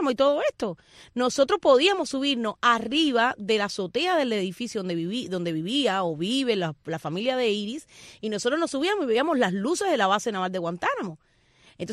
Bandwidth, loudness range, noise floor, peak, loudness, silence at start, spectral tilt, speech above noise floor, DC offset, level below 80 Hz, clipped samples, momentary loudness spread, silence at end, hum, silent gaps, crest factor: 14 kHz; 4 LU; -59 dBFS; -8 dBFS; -25 LUFS; 0 s; -4 dB/octave; 34 dB; under 0.1%; -64 dBFS; under 0.1%; 10 LU; 0 s; none; none; 18 dB